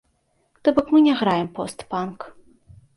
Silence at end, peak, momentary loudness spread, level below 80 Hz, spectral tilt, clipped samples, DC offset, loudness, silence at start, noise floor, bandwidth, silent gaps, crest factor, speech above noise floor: 0.65 s; -4 dBFS; 16 LU; -58 dBFS; -6 dB/octave; under 0.1%; under 0.1%; -21 LUFS; 0.65 s; -67 dBFS; 11.5 kHz; none; 18 dB; 47 dB